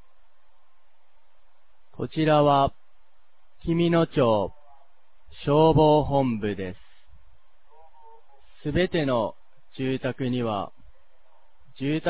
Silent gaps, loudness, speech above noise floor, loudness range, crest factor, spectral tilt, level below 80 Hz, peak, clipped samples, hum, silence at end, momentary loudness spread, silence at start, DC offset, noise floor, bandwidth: none; -24 LUFS; 45 dB; 7 LU; 18 dB; -11 dB/octave; -48 dBFS; -8 dBFS; under 0.1%; none; 0 s; 15 LU; 2 s; 0.8%; -68 dBFS; 4 kHz